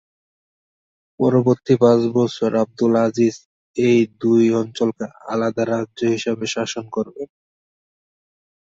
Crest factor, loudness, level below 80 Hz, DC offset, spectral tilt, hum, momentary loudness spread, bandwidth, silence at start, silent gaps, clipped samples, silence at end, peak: 16 dB; -19 LUFS; -62 dBFS; under 0.1%; -6.5 dB/octave; none; 11 LU; 8 kHz; 1.2 s; 3.45-3.74 s; under 0.1%; 1.4 s; -2 dBFS